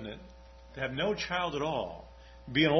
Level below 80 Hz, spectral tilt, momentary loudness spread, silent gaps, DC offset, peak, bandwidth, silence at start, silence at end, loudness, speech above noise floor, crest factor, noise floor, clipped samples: -54 dBFS; -5.5 dB/octave; 20 LU; none; under 0.1%; -12 dBFS; 6.4 kHz; 0 s; 0 s; -33 LUFS; 22 dB; 20 dB; -52 dBFS; under 0.1%